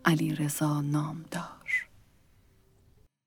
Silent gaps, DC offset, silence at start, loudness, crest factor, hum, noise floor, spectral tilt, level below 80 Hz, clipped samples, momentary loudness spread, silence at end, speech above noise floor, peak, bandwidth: none; under 0.1%; 0.05 s; -31 LUFS; 26 dB; none; -62 dBFS; -5.5 dB/octave; -66 dBFS; under 0.1%; 10 LU; 1.4 s; 34 dB; -6 dBFS; 19.5 kHz